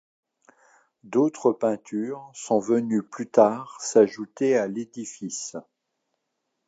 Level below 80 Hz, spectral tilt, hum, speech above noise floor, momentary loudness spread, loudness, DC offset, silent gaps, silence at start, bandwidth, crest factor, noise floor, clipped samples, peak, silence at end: -78 dBFS; -5 dB/octave; none; 55 dB; 14 LU; -24 LUFS; under 0.1%; none; 1.05 s; 9.2 kHz; 22 dB; -79 dBFS; under 0.1%; -4 dBFS; 1.05 s